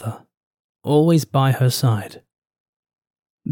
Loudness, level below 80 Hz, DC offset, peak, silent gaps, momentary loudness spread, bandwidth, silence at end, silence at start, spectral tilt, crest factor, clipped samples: -18 LUFS; -68 dBFS; under 0.1%; -4 dBFS; 0.37-0.51 s, 0.60-0.75 s, 2.60-2.83 s, 2.98-3.02 s, 3.10-3.14 s, 3.30-3.38 s; 17 LU; 18 kHz; 0 s; 0 s; -6.5 dB/octave; 16 dB; under 0.1%